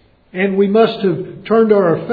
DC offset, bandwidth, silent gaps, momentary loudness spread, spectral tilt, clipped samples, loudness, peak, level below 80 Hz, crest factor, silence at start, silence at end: under 0.1%; 5 kHz; none; 9 LU; -10 dB/octave; under 0.1%; -14 LUFS; 0 dBFS; -56 dBFS; 14 dB; 0.35 s; 0 s